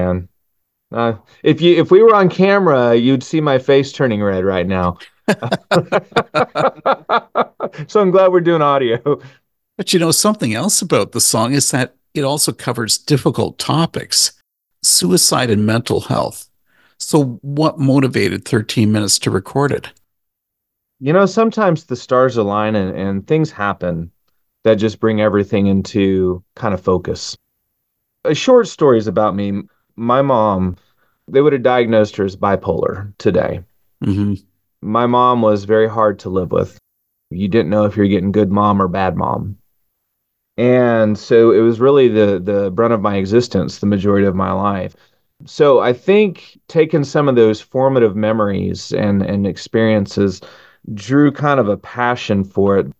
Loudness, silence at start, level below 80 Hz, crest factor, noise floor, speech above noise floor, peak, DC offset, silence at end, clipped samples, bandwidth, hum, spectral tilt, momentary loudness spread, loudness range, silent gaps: -15 LUFS; 0 s; -42 dBFS; 16 dB; -76 dBFS; 62 dB; 0 dBFS; under 0.1%; 0.05 s; under 0.1%; 13 kHz; none; -5 dB/octave; 10 LU; 4 LU; none